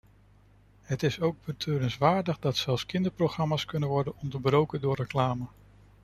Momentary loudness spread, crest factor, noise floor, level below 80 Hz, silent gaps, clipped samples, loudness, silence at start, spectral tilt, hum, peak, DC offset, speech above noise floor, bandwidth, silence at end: 6 LU; 20 dB; -59 dBFS; -56 dBFS; none; under 0.1%; -29 LUFS; 0.9 s; -6.5 dB/octave; 50 Hz at -50 dBFS; -8 dBFS; under 0.1%; 31 dB; 13.5 kHz; 0.55 s